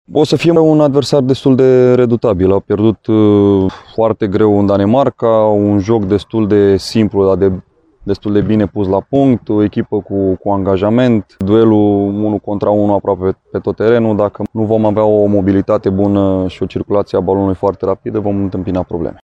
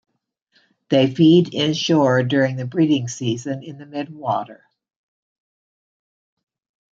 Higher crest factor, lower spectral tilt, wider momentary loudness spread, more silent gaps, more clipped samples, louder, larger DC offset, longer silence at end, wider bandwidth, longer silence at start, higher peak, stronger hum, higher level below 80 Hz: second, 12 dB vs 18 dB; first, -8 dB/octave vs -6 dB/octave; second, 8 LU vs 16 LU; neither; neither; first, -12 LUFS vs -18 LUFS; neither; second, 0.1 s vs 2.4 s; first, 11 kHz vs 7.8 kHz; second, 0.1 s vs 0.9 s; first, 0 dBFS vs -4 dBFS; neither; first, -42 dBFS vs -66 dBFS